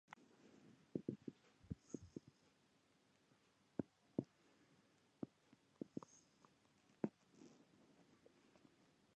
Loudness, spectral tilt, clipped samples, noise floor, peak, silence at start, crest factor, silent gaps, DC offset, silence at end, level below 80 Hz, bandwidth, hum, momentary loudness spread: -53 LUFS; -7.5 dB/octave; under 0.1%; -78 dBFS; -26 dBFS; 0.1 s; 30 dB; none; under 0.1%; 1.65 s; -78 dBFS; 9 kHz; none; 18 LU